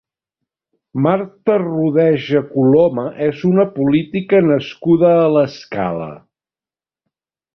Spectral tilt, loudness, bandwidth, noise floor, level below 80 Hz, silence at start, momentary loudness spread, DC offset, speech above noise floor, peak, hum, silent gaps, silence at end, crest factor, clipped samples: -9 dB/octave; -15 LUFS; 6.4 kHz; under -90 dBFS; -56 dBFS; 0.95 s; 9 LU; under 0.1%; over 75 dB; -2 dBFS; none; none; 1.35 s; 14 dB; under 0.1%